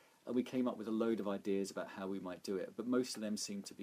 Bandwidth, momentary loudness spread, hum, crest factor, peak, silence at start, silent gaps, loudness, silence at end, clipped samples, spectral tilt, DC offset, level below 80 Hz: 15.5 kHz; 7 LU; none; 16 dB; -22 dBFS; 0.25 s; none; -40 LUFS; 0 s; under 0.1%; -5 dB/octave; under 0.1%; -86 dBFS